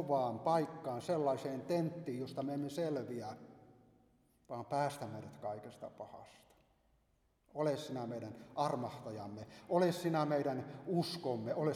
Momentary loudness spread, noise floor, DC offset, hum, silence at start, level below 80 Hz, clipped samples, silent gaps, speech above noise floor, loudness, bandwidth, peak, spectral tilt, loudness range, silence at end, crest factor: 15 LU; -76 dBFS; under 0.1%; none; 0 s; -78 dBFS; under 0.1%; none; 38 dB; -39 LUFS; 16 kHz; -20 dBFS; -6.5 dB/octave; 8 LU; 0 s; 20 dB